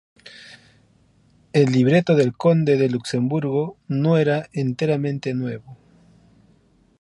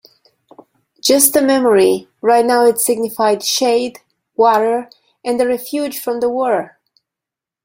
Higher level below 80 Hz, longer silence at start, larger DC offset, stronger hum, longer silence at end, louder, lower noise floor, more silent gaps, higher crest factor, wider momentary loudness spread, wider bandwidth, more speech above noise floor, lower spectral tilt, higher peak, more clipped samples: about the same, -62 dBFS vs -60 dBFS; second, 0.25 s vs 1.05 s; neither; neither; first, 1.25 s vs 0.95 s; second, -20 LUFS vs -15 LUFS; second, -58 dBFS vs -86 dBFS; neither; about the same, 18 dB vs 16 dB; about the same, 10 LU vs 10 LU; second, 11.5 kHz vs 16.5 kHz; second, 38 dB vs 72 dB; first, -7.5 dB/octave vs -2.5 dB/octave; second, -4 dBFS vs 0 dBFS; neither